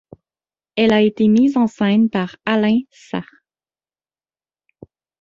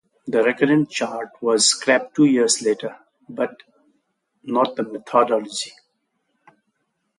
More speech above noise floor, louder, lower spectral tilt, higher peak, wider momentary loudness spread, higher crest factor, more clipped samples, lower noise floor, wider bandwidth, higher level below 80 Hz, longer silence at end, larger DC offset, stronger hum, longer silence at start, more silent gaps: first, over 74 dB vs 53 dB; first, -17 LUFS vs -20 LUFS; first, -7 dB/octave vs -3 dB/octave; about the same, -2 dBFS vs -2 dBFS; about the same, 14 LU vs 13 LU; about the same, 18 dB vs 18 dB; neither; first, under -90 dBFS vs -72 dBFS; second, 7.4 kHz vs 11.5 kHz; first, -58 dBFS vs -72 dBFS; first, 2 s vs 1.5 s; neither; neither; first, 0.75 s vs 0.25 s; neither